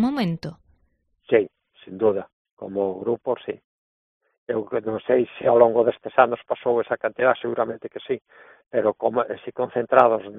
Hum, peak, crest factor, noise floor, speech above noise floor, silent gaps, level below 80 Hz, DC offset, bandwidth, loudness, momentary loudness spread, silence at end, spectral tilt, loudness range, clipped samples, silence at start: none; 0 dBFS; 22 dB; -67 dBFS; 45 dB; 2.33-2.45 s, 2.51-2.57 s, 3.64-4.21 s, 4.38-4.46 s; -64 dBFS; under 0.1%; 4.6 kHz; -23 LUFS; 14 LU; 0 s; -5 dB/octave; 6 LU; under 0.1%; 0 s